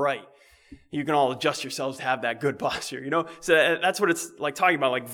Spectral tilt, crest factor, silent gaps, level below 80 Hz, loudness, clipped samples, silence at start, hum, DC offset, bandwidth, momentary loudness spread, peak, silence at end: -3.5 dB/octave; 20 dB; none; -64 dBFS; -25 LUFS; under 0.1%; 0 s; none; under 0.1%; 20 kHz; 10 LU; -6 dBFS; 0 s